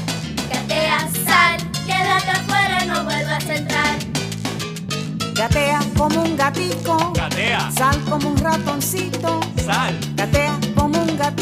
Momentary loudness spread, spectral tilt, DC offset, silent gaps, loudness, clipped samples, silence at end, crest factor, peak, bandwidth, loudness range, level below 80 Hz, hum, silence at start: 7 LU; -4 dB/octave; under 0.1%; none; -19 LUFS; under 0.1%; 0 s; 18 dB; 0 dBFS; 16 kHz; 3 LU; -36 dBFS; none; 0 s